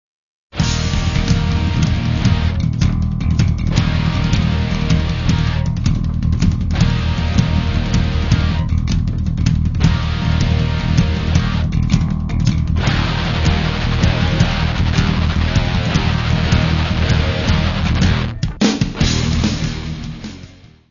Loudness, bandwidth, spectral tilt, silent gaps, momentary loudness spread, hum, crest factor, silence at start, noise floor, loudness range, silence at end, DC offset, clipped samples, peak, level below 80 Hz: -17 LUFS; 7.4 kHz; -6 dB/octave; none; 3 LU; none; 16 dB; 0.55 s; -40 dBFS; 1 LU; 0.25 s; under 0.1%; under 0.1%; 0 dBFS; -22 dBFS